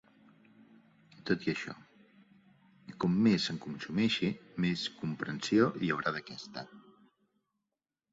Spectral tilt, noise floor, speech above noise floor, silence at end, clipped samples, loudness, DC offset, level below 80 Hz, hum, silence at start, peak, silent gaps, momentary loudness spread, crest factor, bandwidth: -5.5 dB/octave; -89 dBFS; 57 dB; 1.3 s; under 0.1%; -32 LUFS; under 0.1%; -70 dBFS; none; 1.25 s; -14 dBFS; none; 17 LU; 22 dB; 8 kHz